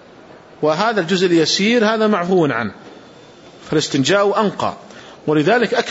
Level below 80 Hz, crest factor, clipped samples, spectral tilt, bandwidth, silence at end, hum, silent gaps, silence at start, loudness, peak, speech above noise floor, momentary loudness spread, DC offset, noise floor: -60 dBFS; 14 dB; under 0.1%; -4.5 dB/octave; 8 kHz; 0 s; none; none; 0.6 s; -16 LUFS; -4 dBFS; 26 dB; 9 LU; under 0.1%; -42 dBFS